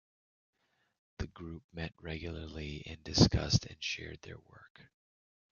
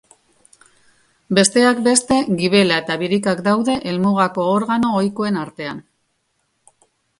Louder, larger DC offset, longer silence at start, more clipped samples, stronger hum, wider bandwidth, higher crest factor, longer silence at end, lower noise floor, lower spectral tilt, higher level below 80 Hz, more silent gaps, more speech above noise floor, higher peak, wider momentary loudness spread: second, -34 LUFS vs -17 LUFS; neither; about the same, 1.2 s vs 1.3 s; neither; neither; second, 7.2 kHz vs 11.5 kHz; first, 26 dB vs 18 dB; second, 0.75 s vs 1.4 s; first, under -90 dBFS vs -68 dBFS; about the same, -5 dB/octave vs -4 dB/octave; first, -48 dBFS vs -56 dBFS; first, 1.64-1.69 s, 4.70-4.75 s vs none; first, over 55 dB vs 51 dB; second, -12 dBFS vs 0 dBFS; first, 20 LU vs 9 LU